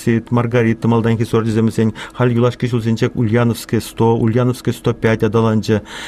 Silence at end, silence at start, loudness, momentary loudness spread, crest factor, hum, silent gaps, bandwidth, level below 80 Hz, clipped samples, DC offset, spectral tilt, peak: 0 s; 0 s; -16 LUFS; 4 LU; 12 dB; none; none; 14.5 kHz; -44 dBFS; under 0.1%; under 0.1%; -7.5 dB/octave; -2 dBFS